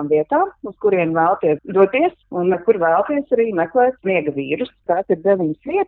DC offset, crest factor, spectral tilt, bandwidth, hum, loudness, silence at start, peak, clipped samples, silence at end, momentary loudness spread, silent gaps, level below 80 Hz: under 0.1%; 16 dB; -10 dB/octave; 4.1 kHz; none; -18 LUFS; 0 s; 0 dBFS; under 0.1%; 0 s; 6 LU; none; -58 dBFS